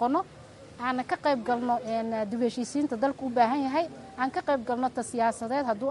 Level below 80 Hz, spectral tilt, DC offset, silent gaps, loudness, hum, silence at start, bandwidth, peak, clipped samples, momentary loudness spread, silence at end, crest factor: -64 dBFS; -5 dB/octave; under 0.1%; none; -29 LUFS; none; 0 s; 11.5 kHz; -10 dBFS; under 0.1%; 6 LU; 0 s; 18 dB